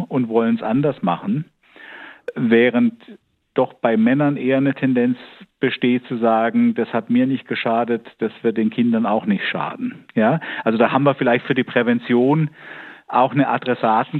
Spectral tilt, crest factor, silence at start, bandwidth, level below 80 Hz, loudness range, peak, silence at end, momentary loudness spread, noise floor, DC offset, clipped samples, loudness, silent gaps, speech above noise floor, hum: -9.5 dB/octave; 18 dB; 0 s; 4.3 kHz; -68 dBFS; 2 LU; -2 dBFS; 0 s; 10 LU; -41 dBFS; under 0.1%; under 0.1%; -19 LUFS; none; 23 dB; none